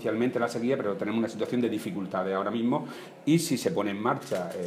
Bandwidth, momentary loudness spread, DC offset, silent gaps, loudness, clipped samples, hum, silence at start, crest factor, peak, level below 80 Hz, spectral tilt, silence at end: 16 kHz; 6 LU; under 0.1%; none; -29 LUFS; under 0.1%; none; 0 s; 16 dB; -12 dBFS; -74 dBFS; -5.5 dB/octave; 0 s